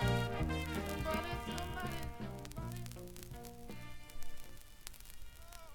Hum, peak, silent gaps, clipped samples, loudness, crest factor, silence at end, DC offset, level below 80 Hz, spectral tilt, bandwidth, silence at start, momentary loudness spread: none; -20 dBFS; none; under 0.1%; -42 LUFS; 20 dB; 0 s; under 0.1%; -48 dBFS; -5.5 dB/octave; 18 kHz; 0 s; 17 LU